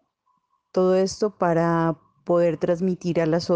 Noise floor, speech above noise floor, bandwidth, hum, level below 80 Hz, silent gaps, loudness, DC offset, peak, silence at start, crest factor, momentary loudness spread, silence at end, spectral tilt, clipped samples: -70 dBFS; 49 dB; 9.2 kHz; none; -58 dBFS; none; -23 LUFS; under 0.1%; -8 dBFS; 0.75 s; 14 dB; 5 LU; 0 s; -7 dB/octave; under 0.1%